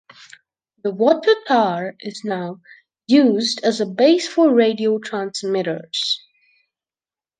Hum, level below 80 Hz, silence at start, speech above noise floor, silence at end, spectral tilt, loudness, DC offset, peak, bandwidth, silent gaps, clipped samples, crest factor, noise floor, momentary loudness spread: none; -74 dBFS; 0.85 s; over 72 dB; 1.2 s; -4.5 dB/octave; -18 LUFS; under 0.1%; -2 dBFS; 9.6 kHz; none; under 0.1%; 18 dB; under -90 dBFS; 12 LU